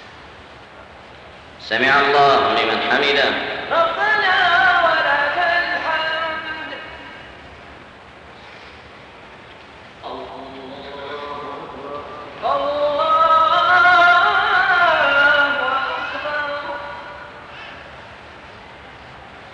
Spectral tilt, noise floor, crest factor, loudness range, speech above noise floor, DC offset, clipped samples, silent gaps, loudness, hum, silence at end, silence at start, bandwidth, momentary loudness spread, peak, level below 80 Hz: -3.5 dB/octave; -41 dBFS; 14 dB; 20 LU; 25 dB; under 0.1%; under 0.1%; none; -16 LUFS; none; 0 s; 0 s; 9.6 kHz; 25 LU; -4 dBFS; -52 dBFS